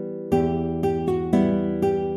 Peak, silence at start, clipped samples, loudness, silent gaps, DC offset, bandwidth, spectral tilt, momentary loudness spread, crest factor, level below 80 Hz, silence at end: -6 dBFS; 0 s; under 0.1%; -23 LUFS; none; under 0.1%; 12.5 kHz; -9 dB/octave; 4 LU; 16 dB; -44 dBFS; 0 s